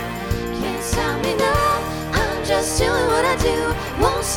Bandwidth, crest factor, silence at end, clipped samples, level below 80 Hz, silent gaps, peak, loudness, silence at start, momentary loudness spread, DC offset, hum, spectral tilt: 18 kHz; 18 dB; 0 s; under 0.1%; -30 dBFS; none; -2 dBFS; -20 LUFS; 0 s; 6 LU; under 0.1%; none; -4 dB/octave